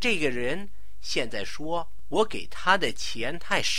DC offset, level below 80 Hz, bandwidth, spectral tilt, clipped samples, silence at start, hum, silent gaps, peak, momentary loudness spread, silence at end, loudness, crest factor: 5%; -50 dBFS; 16.5 kHz; -3 dB/octave; under 0.1%; 0 s; none; none; -6 dBFS; 10 LU; 0 s; -28 LUFS; 22 dB